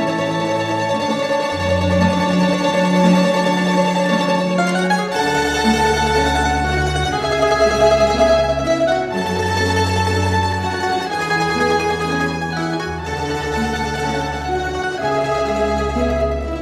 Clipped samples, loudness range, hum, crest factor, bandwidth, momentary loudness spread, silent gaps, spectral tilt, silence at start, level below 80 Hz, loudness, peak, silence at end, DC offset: under 0.1%; 4 LU; none; 16 dB; 15 kHz; 7 LU; none; -5 dB/octave; 0 s; -32 dBFS; -17 LUFS; -2 dBFS; 0 s; under 0.1%